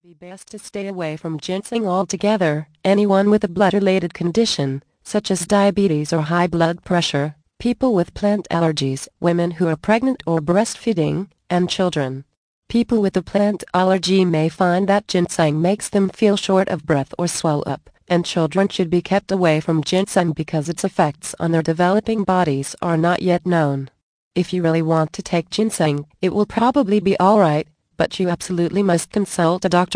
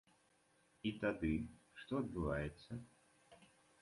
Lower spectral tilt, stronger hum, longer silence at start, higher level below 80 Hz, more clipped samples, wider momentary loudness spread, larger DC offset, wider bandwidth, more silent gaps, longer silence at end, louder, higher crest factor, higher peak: second, -5.5 dB/octave vs -7.5 dB/octave; neither; second, 0.2 s vs 0.85 s; first, -50 dBFS vs -58 dBFS; neither; second, 8 LU vs 12 LU; neither; about the same, 10.5 kHz vs 11.5 kHz; first, 12.37-12.62 s, 24.03-24.31 s vs none; second, 0 s vs 0.35 s; first, -19 LUFS vs -43 LUFS; about the same, 16 dB vs 20 dB; first, -2 dBFS vs -26 dBFS